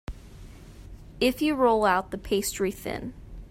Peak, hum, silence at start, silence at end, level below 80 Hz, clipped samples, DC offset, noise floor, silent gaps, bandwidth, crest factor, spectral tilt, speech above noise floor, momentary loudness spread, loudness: -10 dBFS; none; 0.1 s; 0 s; -46 dBFS; under 0.1%; under 0.1%; -45 dBFS; none; 16 kHz; 18 dB; -4 dB/octave; 20 dB; 21 LU; -26 LUFS